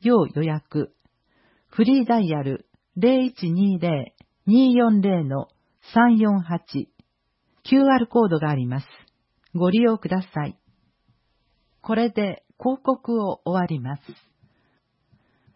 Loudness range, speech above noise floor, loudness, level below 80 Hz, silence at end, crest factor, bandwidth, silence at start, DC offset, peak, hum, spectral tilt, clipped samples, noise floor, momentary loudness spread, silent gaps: 6 LU; 51 dB; -22 LUFS; -64 dBFS; 1.45 s; 16 dB; 5.8 kHz; 0 s; under 0.1%; -6 dBFS; none; -12 dB/octave; under 0.1%; -71 dBFS; 15 LU; none